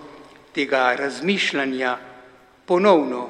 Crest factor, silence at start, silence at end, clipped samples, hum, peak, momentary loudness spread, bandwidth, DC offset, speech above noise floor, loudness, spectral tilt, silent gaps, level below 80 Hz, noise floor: 20 dB; 0 s; 0 s; under 0.1%; none; -2 dBFS; 10 LU; 11.5 kHz; under 0.1%; 29 dB; -21 LUFS; -4.5 dB/octave; none; -68 dBFS; -49 dBFS